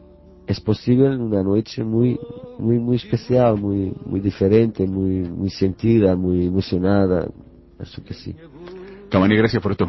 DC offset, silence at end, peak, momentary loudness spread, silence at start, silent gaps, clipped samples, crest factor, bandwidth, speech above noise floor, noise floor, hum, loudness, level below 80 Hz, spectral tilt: under 0.1%; 0 s; -2 dBFS; 19 LU; 0.5 s; none; under 0.1%; 18 dB; 6 kHz; 19 dB; -38 dBFS; none; -19 LUFS; -40 dBFS; -9 dB/octave